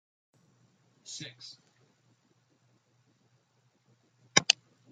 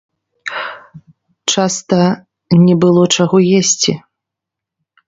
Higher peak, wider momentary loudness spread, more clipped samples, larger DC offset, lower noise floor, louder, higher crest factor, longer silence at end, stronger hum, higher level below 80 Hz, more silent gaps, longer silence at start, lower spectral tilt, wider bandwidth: about the same, 0 dBFS vs 0 dBFS; first, 25 LU vs 15 LU; neither; neither; second, -71 dBFS vs -82 dBFS; second, -28 LUFS vs -13 LUFS; first, 38 dB vs 14 dB; second, 0.4 s vs 1.1 s; neither; second, -80 dBFS vs -54 dBFS; neither; first, 1.1 s vs 0.45 s; second, -0.5 dB/octave vs -4.5 dB/octave; first, 12.5 kHz vs 7.8 kHz